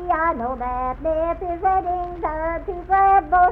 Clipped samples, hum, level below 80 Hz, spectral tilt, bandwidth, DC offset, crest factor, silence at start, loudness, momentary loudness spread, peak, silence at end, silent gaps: under 0.1%; none; -36 dBFS; -9 dB/octave; 4 kHz; under 0.1%; 14 dB; 0 s; -21 LUFS; 10 LU; -6 dBFS; 0 s; none